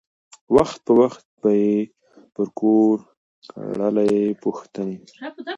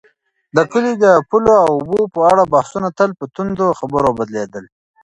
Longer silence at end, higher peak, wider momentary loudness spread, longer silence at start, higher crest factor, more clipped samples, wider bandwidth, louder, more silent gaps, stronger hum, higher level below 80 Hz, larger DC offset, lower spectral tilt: second, 0 s vs 0.4 s; about the same, -2 dBFS vs 0 dBFS; first, 16 LU vs 11 LU; about the same, 0.5 s vs 0.55 s; about the same, 18 dB vs 14 dB; neither; second, 9 kHz vs 11.5 kHz; second, -20 LUFS vs -15 LUFS; first, 1.25-1.37 s, 3.17-3.42 s vs none; neither; second, -56 dBFS vs -48 dBFS; neither; about the same, -7.5 dB/octave vs -6.5 dB/octave